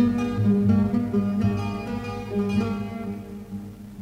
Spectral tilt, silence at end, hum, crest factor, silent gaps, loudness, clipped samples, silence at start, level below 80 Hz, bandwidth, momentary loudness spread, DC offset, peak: -8.5 dB/octave; 0 s; none; 16 dB; none; -25 LUFS; under 0.1%; 0 s; -46 dBFS; 9.8 kHz; 16 LU; under 0.1%; -8 dBFS